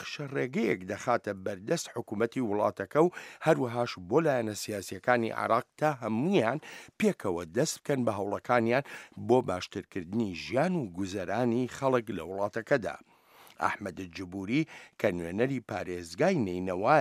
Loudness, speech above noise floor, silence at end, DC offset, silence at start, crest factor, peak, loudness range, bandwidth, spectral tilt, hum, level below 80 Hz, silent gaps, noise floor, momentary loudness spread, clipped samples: -31 LUFS; 28 dB; 0 s; under 0.1%; 0 s; 22 dB; -8 dBFS; 4 LU; 15 kHz; -5.5 dB/octave; none; -68 dBFS; none; -58 dBFS; 10 LU; under 0.1%